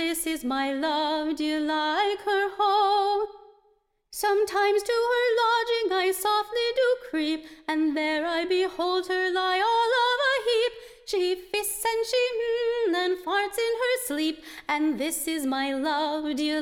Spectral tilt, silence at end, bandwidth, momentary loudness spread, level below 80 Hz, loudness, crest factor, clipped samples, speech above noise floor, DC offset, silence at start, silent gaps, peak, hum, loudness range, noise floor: -1 dB/octave; 0 s; 18 kHz; 6 LU; -62 dBFS; -25 LUFS; 14 dB; under 0.1%; 41 dB; under 0.1%; 0 s; none; -12 dBFS; none; 2 LU; -67 dBFS